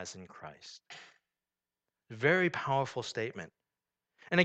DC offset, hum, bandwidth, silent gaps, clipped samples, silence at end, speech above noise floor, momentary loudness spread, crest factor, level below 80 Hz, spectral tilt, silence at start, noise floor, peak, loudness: under 0.1%; none; 8.8 kHz; none; under 0.1%; 0 s; over 55 dB; 23 LU; 26 dB; -76 dBFS; -5 dB/octave; 0 s; under -90 dBFS; -10 dBFS; -32 LUFS